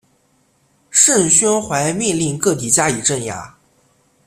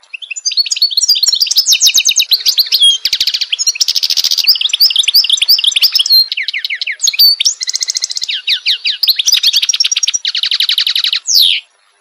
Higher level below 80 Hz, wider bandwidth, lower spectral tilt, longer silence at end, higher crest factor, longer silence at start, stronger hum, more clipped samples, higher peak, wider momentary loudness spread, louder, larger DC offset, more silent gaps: first, -52 dBFS vs -62 dBFS; about the same, 16 kHz vs 16.5 kHz; first, -3 dB/octave vs 6 dB/octave; first, 0.8 s vs 0.4 s; first, 18 dB vs 12 dB; first, 0.9 s vs 0.15 s; neither; neither; about the same, 0 dBFS vs 0 dBFS; about the same, 9 LU vs 8 LU; second, -14 LUFS vs -9 LUFS; neither; neither